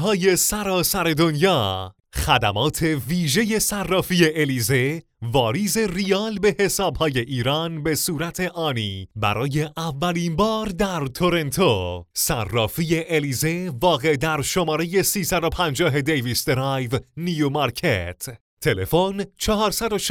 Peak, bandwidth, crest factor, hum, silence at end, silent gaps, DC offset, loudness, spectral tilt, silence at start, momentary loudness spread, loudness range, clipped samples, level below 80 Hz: -2 dBFS; over 20 kHz; 20 dB; none; 0 s; 18.41-18.57 s; under 0.1%; -21 LUFS; -4 dB/octave; 0 s; 6 LU; 3 LU; under 0.1%; -42 dBFS